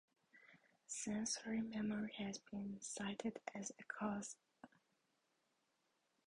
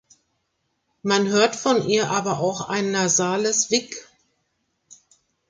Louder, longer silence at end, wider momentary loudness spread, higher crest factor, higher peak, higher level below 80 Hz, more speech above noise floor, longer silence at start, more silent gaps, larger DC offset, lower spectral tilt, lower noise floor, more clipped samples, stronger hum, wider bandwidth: second, -46 LUFS vs -21 LUFS; first, 1.6 s vs 0.55 s; first, 22 LU vs 6 LU; about the same, 18 dB vs 20 dB; second, -30 dBFS vs -4 dBFS; second, -80 dBFS vs -66 dBFS; second, 38 dB vs 52 dB; second, 0.35 s vs 1.05 s; neither; neither; about the same, -3.5 dB/octave vs -3 dB/octave; first, -84 dBFS vs -73 dBFS; neither; neither; about the same, 11 kHz vs 10 kHz